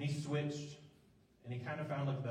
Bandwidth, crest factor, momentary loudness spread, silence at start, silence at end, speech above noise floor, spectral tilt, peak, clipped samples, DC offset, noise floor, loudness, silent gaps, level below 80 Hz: 10.5 kHz; 14 dB; 15 LU; 0 s; 0 s; 28 dB; -6.5 dB/octave; -26 dBFS; under 0.1%; under 0.1%; -68 dBFS; -41 LUFS; none; -76 dBFS